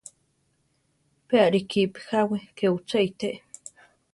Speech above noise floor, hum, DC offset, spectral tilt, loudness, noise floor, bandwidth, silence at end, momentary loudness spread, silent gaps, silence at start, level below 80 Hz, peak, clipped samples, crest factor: 46 dB; none; under 0.1%; -5.5 dB/octave; -25 LUFS; -70 dBFS; 11.5 kHz; 0.75 s; 20 LU; none; 1.3 s; -68 dBFS; -6 dBFS; under 0.1%; 20 dB